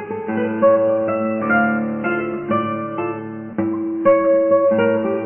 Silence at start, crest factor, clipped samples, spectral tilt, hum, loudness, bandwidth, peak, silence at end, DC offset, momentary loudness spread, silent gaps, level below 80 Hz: 0 s; 14 dB; under 0.1%; -11 dB/octave; none; -18 LUFS; 3.3 kHz; -4 dBFS; 0 s; under 0.1%; 9 LU; none; -58 dBFS